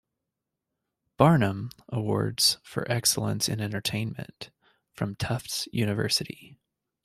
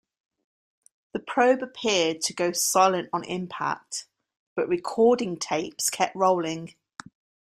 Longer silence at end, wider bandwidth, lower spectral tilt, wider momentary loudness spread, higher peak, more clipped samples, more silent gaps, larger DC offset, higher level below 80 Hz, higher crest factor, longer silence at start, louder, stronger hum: second, 0.5 s vs 0.9 s; about the same, 15.5 kHz vs 15.5 kHz; about the same, -4 dB/octave vs -3 dB/octave; about the same, 17 LU vs 15 LU; about the same, -4 dBFS vs -6 dBFS; neither; second, none vs 4.37-4.56 s; neither; first, -58 dBFS vs -70 dBFS; about the same, 24 dB vs 20 dB; about the same, 1.2 s vs 1.15 s; about the same, -26 LUFS vs -25 LUFS; neither